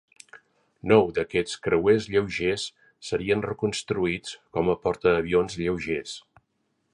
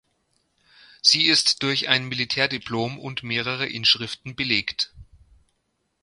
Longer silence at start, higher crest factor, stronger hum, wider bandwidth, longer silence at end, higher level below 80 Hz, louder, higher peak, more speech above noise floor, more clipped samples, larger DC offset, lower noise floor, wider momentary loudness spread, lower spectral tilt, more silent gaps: second, 0.35 s vs 1.05 s; about the same, 20 dB vs 24 dB; neither; about the same, 11 kHz vs 11.5 kHz; second, 0.75 s vs 1 s; first, -52 dBFS vs -58 dBFS; second, -25 LUFS vs -21 LUFS; second, -6 dBFS vs 0 dBFS; about the same, 49 dB vs 50 dB; neither; neither; about the same, -74 dBFS vs -73 dBFS; about the same, 12 LU vs 12 LU; first, -5.5 dB/octave vs -2.5 dB/octave; neither